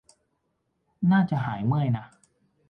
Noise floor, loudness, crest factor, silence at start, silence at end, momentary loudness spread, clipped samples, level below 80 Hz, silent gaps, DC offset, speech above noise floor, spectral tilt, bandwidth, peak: -75 dBFS; -25 LUFS; 16 dB; 1 s; 0.65 s; 6 LU; under 0.1%; -60 dBFS; none; under 0.1%; 52 dB; -9 dB/octave; 9 kHz; -12 dBFS